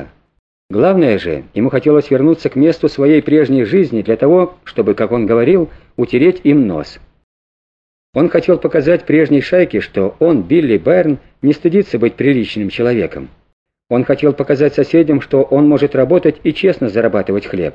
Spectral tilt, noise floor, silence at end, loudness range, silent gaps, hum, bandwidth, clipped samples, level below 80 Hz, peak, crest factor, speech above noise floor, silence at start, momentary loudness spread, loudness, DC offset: -9 dB/octave; under -90 dBFS; 0.05 s; 3 LU; 0.39-0.69 s, 7.24-8.13 s, 13.53-13.66 s; none; 7.2 kHz; under 0.1%; -46 dBFS; 0 dBFS; 12 dB; over 78 dB; 0 s; 7 LU; -13 LUFS; under 0.1%